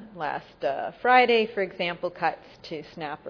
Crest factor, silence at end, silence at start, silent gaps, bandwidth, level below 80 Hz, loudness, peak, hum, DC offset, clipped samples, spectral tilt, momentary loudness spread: 20 dB; 0 s; 0 s; none; 5.4 kHz; -64 dBFS; -25 LUFS; -6 dBFS; none; under 0.1%; under 0.1%; -5.5 dB/octave; 19 LU